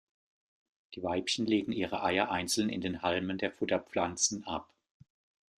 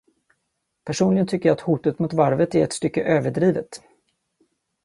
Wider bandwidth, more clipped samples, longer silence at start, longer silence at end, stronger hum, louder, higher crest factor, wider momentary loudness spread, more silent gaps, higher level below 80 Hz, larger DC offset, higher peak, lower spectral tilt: first, 14.5 kHz vs 11.5 kHz; neither; about the same, 0.9 s vs 0.85 s; about the same, 0.95 s vs 1.05 s; neither; second, -32 LUFS vs -21 LUFS; about the same, 22 dB vs 18 dB; about the same, 9 LU vs 11 LU; neither; second, -68 dBFS vs -58 dBFS; neither; second, -12 dBFS vs -4 dBFS; second, -3 dB/octave vs -6.5 dB/octave